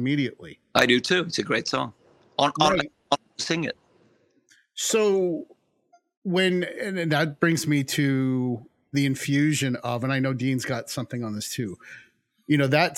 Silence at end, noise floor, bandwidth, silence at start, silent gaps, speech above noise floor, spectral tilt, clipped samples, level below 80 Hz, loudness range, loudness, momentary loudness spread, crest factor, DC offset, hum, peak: 0 s; -64 dBFS; 17 kHz; 0 s; 6.17-6.22 s; 39 dB; -4.5 dB/octave; under 0.1%; -62 dBFS; 4 LU; -25 LUFS; 12 LU; 22 dB; under 0.1%; none; -4 dBFS